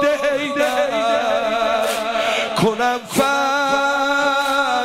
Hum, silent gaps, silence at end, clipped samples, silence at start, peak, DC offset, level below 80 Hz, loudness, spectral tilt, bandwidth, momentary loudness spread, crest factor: none; none; 0 s; under 0.1%; 0 s; -6 dBFS; under 0.1%; -54 dBFS; -18 LUFS; -3.5 dB/octave; 16 kHz; 2 LU; 12 dB